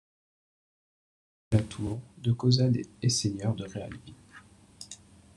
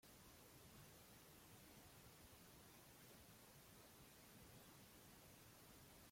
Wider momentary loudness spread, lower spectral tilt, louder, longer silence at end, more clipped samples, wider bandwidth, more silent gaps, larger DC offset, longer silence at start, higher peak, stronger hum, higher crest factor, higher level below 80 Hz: first, 21 LU vs 1 LU; first, -5.5 dB/octave vs -3.5 dB/octave; first, -29 LUFS vs -65 LUFS; first, 0.4 s vs 0 s; neither; second, 11.5 kHz vs 16.5 kHz; neither; neither; first, 1.5 s vs 0 s; first, -10 dBFS vs -52 dBFS; neither; first, 22 dB vs 14 dB; first, -58 dBFS vs -78 dBFS